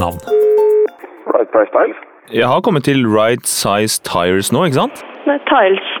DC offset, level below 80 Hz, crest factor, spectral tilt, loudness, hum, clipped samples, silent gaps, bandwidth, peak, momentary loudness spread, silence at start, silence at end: under 0.1%; -54 dBFS; 12 dB; -4.5 dB/octave; -14 LUFS; none; under 0.1%; none; 19.5 kHz; 0 dBFS; 7 LU; 0 s; 0 s